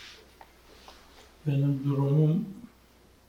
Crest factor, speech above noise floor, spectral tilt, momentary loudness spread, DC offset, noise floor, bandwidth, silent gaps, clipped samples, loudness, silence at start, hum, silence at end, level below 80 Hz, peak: 16 dB; 33 dB; -9 dB/octave; 20 LU; under 0.1%; -59 dBFS; 7 kHz; none; under 0.1%; -27 LUFS; 0 s; none; 0.65 s; -62 dBFS; -14 dBFS